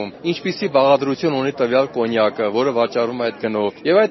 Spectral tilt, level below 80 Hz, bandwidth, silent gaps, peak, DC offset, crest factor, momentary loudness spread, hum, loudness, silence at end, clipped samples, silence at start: -4 dB/octave; -62 dBFS; 6.2 kHz; none; -2 dBFS; under 0.1%; 16 dB; 6 LU; none; -19 LUFS; 0 s; under 0.1%; 0 s